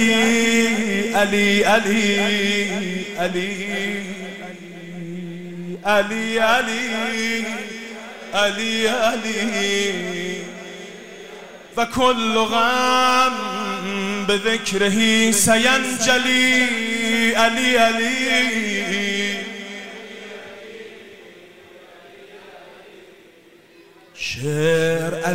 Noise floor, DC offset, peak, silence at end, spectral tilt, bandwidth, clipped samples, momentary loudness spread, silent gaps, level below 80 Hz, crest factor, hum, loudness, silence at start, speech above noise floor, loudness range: -49 dBFS; 0.9%; -4 dBFS; 0 s; -3 dB/octave; 16 kHz; under 0.1%; 19 LU; none; -54 dBFS; 18 dB; none; -18 LUFS; 0 s; 31 dB; 11 LU